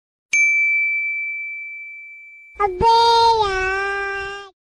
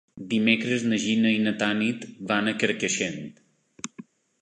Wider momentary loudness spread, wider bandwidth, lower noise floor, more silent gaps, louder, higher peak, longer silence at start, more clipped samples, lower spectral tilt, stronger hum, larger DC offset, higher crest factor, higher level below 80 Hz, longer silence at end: about the same, 18 LU vs 17 LU; first, 12 kHz vs 9.4 kHz; second, -41 dBFS vs -48 dBFS; neither; first, -17 LUFS vs -24 LUFS; about the same, -6 dBFS vs -6 dBFS; first, 0.35 s vs 0.15 s; neither; second, -2 dB/octave vs -4 dB/octave; neither; neither; second, 12 dB vs 20 dB; first, -44 dBFS vs -68 dBFS; second, 0.25 s vs 0.4 s